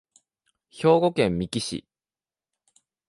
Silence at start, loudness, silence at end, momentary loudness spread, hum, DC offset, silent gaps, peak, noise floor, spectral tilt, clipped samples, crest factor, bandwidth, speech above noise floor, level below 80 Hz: 0.75 s; -23 LUFS; 1.3 s; 12 LU; none; under 0.1%; none; -6 dBFS; under -90 dBFS; -5.5 dB/octave; under 0.1%; 20 dB; 11.5 kHz; over 68 dB; -54 dBFS